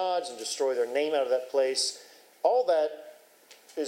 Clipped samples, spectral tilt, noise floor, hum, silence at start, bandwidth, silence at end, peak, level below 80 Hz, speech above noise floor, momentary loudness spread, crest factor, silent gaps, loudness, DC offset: under 0.1%; -0.5 dB/octave; -56 dBFS; none; 0 s; 16 kHz; 0 s; -10 dBFS; under -90 dBFS; 29 dB; 9 LU; 18 dB; none; -28 LUFS; under 0.1%